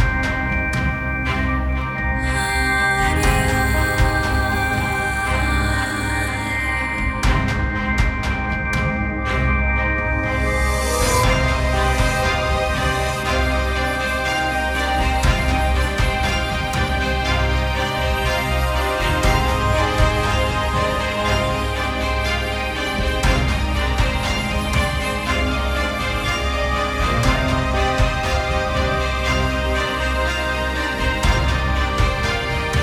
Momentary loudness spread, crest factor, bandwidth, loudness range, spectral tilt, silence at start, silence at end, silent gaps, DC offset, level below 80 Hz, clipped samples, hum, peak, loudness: 3 LU; 16 dB; 17 kHz; 2 LU; -4.5 dB/octave; 0 s; 0 s; none; under 0.1%; -24 dBFS; under 0.1%; none; -2 dBFS; -19 LUFS